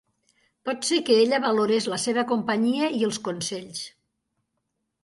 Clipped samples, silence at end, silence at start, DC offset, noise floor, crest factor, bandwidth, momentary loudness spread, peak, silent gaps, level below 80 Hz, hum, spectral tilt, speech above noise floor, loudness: under 0.1%; 1.15 s; 0.65 s; under 0.1%; -78 dBFS; 18 dB; 11.5 kHz; 14 LU; -8 dBFS; none; -72 dBFS; none; -3.5 dB/octave; 55 dB; -24 LUFS